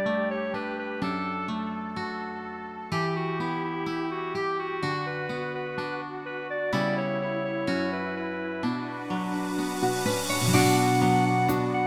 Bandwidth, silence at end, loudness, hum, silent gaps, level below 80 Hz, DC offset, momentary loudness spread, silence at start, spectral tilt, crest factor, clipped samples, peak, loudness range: 17.5 kHz; 0 s; -28 LUFS; none; none; -60 dBFS; under 0.1%; 11 LU; 0 s; -5 dB/octave; 20 dB; under 0.1%; -8 dBFS; 6 LU